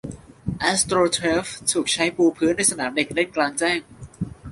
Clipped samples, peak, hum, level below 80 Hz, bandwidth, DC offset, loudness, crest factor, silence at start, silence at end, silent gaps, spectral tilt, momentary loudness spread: under 0.1%; -4 dBFS; none; -48 dBFS; 11.5 kHz; under 0.1%; -21 LUFS; 18 dB; 0.05 s; 0 s; none; -3 dB/octave; 14 LU